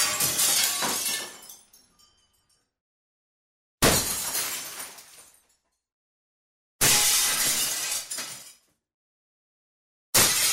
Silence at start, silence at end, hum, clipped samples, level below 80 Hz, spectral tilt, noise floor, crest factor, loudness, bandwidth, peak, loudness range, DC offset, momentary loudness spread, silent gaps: 0 s; 0 s; none; under 0.1%; -52 dBFS; -0.5 dB/octave; -71 dBFS; 22 dB; -22 LUFS; 16.5 kHz; -6 dBFS; 5 LU; under 0.1%; 18 LU; 2.81-3.78 s, 5.92-6.79 s, 8.94-10.13 s